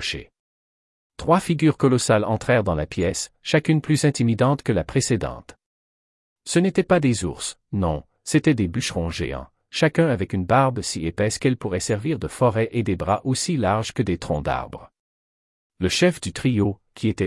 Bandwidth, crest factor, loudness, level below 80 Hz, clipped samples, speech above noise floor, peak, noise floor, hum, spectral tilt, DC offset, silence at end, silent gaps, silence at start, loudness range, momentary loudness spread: 12 kHz; 18 dB; -22 LUFS; -46 dBFS; under 0.1%; over 69 dB; -4 dBFS; under -90 dBFS; none; -5.5 dB/octave; under 0.1%; 0 s; 0.39-1.10 s, 5.66-6.36 s, 14.99-15.70 s; 0 s; 4 LU; 9 LU